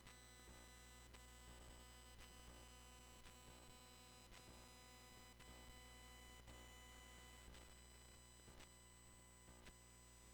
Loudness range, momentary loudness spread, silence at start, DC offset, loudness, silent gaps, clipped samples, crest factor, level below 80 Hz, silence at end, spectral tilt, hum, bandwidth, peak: 1 LU; 3 LU; 0 s; under 0.1%; -63 LUFS; none; under 0.1%; 18 dB; -68 dBFS; 0 s; -3 dB/octave; 60 Hz at -70 dBFS; over 20 kHz; -46 dBFS